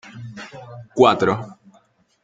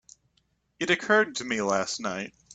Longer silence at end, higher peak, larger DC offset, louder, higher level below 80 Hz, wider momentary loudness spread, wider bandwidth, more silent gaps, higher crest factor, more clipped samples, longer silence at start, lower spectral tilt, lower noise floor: first, 0.7 s vs 0 s; first, -2 dBFS vs -10 dBFS; neither; first, -18 LUFS vs -26 LUFS; first, -60 dBFS vs -66 dBFS; first, 23 LU vs 11 LU; second, 7.8 kHz vs 9.2 kHz; neither; about the same, 20 dB vs 20 dB; neither; second, 0.15 s vs 0.8 s; first, -6 dB/octave vs -3 dB/octave; second, -58 dBFS vs -71 dBFS